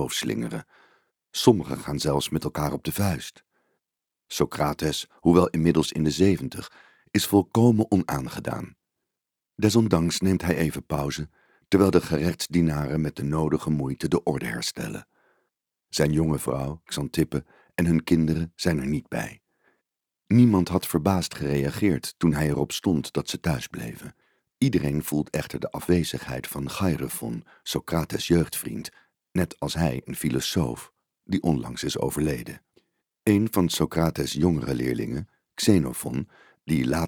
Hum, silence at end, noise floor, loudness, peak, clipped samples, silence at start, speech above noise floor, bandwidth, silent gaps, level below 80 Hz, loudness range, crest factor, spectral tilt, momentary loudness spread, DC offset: none; 0 s; -87 dBFS; -25 LUFS; -4 dBFS; under 0.1%; 0 s; 63 dB; 20 kHz; none; -46 dBFS; 5 LU; 22 dB; -5.5 dB/octave; 13 LU; under 0.1%